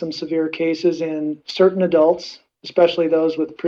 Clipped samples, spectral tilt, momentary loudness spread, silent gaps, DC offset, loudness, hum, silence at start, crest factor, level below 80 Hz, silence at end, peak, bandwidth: under 0.1%; -6.5 dB/octave; 10 LU; none; under 0.1%; -19 LUFS; none; 0 s; 16 dB; -66 dBFS; 0 s; -2 dBFS; 7.2 kHz